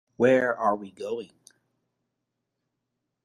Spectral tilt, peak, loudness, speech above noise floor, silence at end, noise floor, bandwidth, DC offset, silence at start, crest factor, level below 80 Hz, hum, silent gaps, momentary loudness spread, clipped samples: -6.5 dB/octave; -8 dBFS; -26 LUFS; 57 dB; 2 s; -82 dBFS; 10.5 kHz; under 0.1%; 0.2 s; 20 dB; -72 dBFS; none; none; 14 LU; under 0.1%